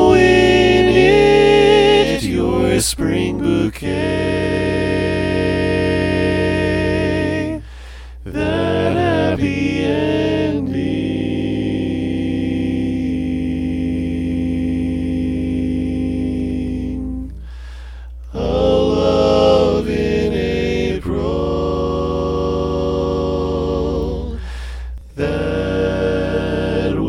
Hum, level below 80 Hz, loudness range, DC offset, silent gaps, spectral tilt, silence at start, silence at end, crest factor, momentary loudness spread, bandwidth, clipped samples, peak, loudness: none; -30 dBFS; 6 LU; under 0.1%; none; -6 dB/octave; 0 s; 0 s; 16 dB; 13 LU; 16 kHz; under 0.1%; 0 dBFS; -17 LUFS